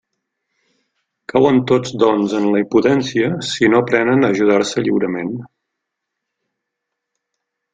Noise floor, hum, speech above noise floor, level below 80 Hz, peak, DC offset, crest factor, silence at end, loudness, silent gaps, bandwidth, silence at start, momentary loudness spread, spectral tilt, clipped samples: -79 dBFS; none; 64 dB; -56 dBFS; -2 dBFS; under 0.1%; 16 dB; 2.3 s; -16 LUFS; none; 9.4 kHz; 1.35 s; 6 LU; -5.5 dB/octave; under 0.1%